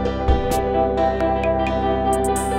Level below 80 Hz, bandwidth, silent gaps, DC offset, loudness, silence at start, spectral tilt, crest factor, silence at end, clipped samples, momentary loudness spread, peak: -28 dBFS; 16.5 kHz; none; under 0.1%; -20 LUFS; 0 s; -6 dB/octave; 14 dB; 0 s; under 0.1%; 1 LU; -4 dBFS